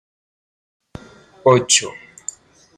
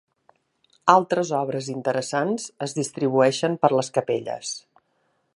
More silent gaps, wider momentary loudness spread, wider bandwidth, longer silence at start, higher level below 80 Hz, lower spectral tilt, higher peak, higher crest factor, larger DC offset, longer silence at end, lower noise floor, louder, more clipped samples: neither; first, 19 LU vs 11 LU; first, 15.5 kHz vs 11.5 kHz; first, 1.45 s vs 0.85 s; first, -58 dBFS vs -72 dBFS; second, -3 dB/octave vs -4.5 dB/octave; about the same, 0 dBFS vs 0 dBFS; about the same, 22 dB vs 24 dB; neither; about the same, 0.85 s vs 0.75 s; second, -43 dBFS vs -70 dBFS; first, -15 LUFS vs -23 LUFS; neither